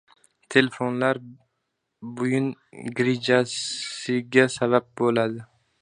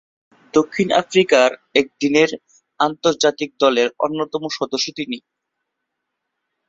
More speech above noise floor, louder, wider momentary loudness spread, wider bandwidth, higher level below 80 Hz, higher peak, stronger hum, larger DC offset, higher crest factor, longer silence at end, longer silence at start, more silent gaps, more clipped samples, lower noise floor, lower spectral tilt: second, 54 dB vs 60 dB; second, -24 LUFS vs -18 LUFS; first, 12 LU vs 9 LU; first, 10.5 kHz vs 7.8 kHz; second, -68 dBFS vs -62 dBFS; about the same, 0 dBFS vs -2 dBFS; neither; neither; first, 24 dB vs 18 dB; second, 0.35 s vs 1.5 s; about the same, 0.5 s vs 0.55 s; neither; neither; about the same, -78 dBFS vs -78 dBFS; first, -5 dB/octave vs -3.5 dB/octave